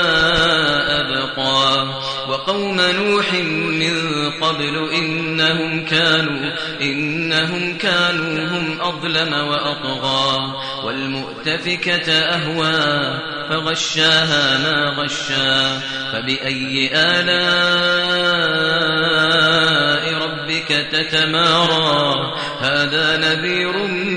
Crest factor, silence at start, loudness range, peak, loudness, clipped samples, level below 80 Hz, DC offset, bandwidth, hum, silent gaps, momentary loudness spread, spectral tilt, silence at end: 16 dB; 0 s; 4 LU; -2 dBFS; -16 LUFS; under 0.1%; -48 dBFS; 0.3%; 10 kHz; none; none; 8 LU; -3.5 dB/octave; 0 s